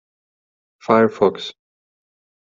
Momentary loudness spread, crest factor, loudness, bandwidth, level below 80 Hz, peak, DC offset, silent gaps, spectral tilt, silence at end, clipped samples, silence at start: 18 LU; 20 dB; -17 LUFS; 7.4 kHz; -64 dBFS; -2 dBFS; under 0.1%; none; -6.5 dB/octave; 0.9 s; under 0.1%; 0.9 s